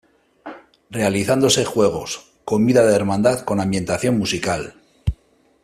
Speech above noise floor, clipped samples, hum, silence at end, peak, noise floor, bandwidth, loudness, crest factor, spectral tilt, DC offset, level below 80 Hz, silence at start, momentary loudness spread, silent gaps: 37 dB; under 0.1%; none; 0.5 s; -2 dBFS; -55 dBFS; 14.5 kHz; -19 LUFS; 18 dB; -4.5 dB/octave; under 0.1%; -42 dBFS; 0.45 s; 17 LU; none